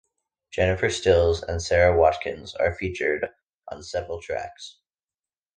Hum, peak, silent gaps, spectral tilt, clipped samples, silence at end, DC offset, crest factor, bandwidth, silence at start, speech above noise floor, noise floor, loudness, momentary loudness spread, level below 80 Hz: none; -4 dBFS; 3.43-3.60 s; -5 dB/octave; under 0.1%; 0.85 s; under 0.1%; 20 dB; 9.8 kHz; 0.55 s; over 67 dB; under -90 dBFS; -24 LUFS; 17 LU; -40 dBFS